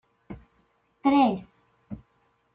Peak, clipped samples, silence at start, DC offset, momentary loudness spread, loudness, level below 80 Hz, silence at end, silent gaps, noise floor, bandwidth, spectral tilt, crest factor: -10 dBFS; under 0.1%; 0.3 s; under 0.1%; 25 LU; -24 LUFS; -60 dBFS; 0.6 s; none; -69 dBFS; 4.9 kHz; -9.5 dB/octave; 20 dB